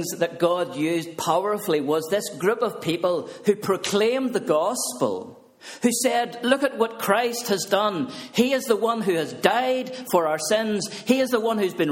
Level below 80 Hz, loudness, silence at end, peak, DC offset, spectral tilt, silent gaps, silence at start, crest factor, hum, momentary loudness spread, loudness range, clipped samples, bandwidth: -68 dBFS; -23 LUFS; 0 s; 0 dBFS; under 0.1%; -4 dB/octave; none; 0 s; 22 dB; none; 5 LU; 1 LU; under 0.1%; 17 kHz